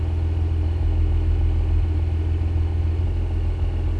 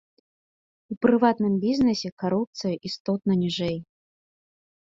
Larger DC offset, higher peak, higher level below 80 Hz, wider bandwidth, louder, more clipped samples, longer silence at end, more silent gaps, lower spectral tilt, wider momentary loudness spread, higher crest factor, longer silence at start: neither; second, -12 dBFS vs -6 dBFS; first, -24 dBFS vs -60 dBFS; second, 4.5 kHz vs 7.6 kHz; about the same, -23 LUFS vs -24 LUFS; neither; second, 0 s vs 1.05 s; second, none vs 0.97-1.01 s, 2.12-2.17 s, 2.47-2.53 s, 3.00-3.05 s; first, -9 dB/octave vs -6.5 dB/octave; second, 3 LU vs 10 LU; second, 10 dB vs 20 dB; second, 0 s vs 0.9 s